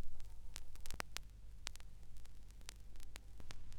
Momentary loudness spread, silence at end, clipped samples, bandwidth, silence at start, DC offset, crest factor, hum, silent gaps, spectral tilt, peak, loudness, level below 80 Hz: 12 LU; 0 s; under 0.1%; 16 kHz; 0 s; under 0.1%; 24 dB; none; none; -2.5 dB/octave; -18 dBFS; -55 LUFS; -52 dBFS